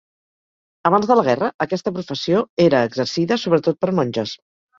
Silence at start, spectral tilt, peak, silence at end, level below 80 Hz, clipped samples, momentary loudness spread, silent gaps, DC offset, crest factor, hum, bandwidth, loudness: 0.85 s; -6 dB/octave; -2 dBFS; 0.45 s; -60 dBFS; under 0.1%; 9 LU; 1.54-1.59 s, 2.49-2.57 s; under 0.1%; 18 dB; none; 7.6 kHz; -19 LUFS